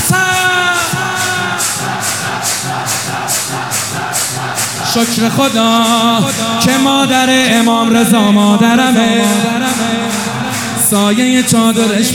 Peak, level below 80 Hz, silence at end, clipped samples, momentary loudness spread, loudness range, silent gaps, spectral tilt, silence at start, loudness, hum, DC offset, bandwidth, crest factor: 0 dBFS; -52 dBFS; 0 s; under 0.1%; 7 LU; 5 LU; none; -3 dB/octave; 0 s; -11 LUFS; none; 0.3%; 18 kHz; 12 dB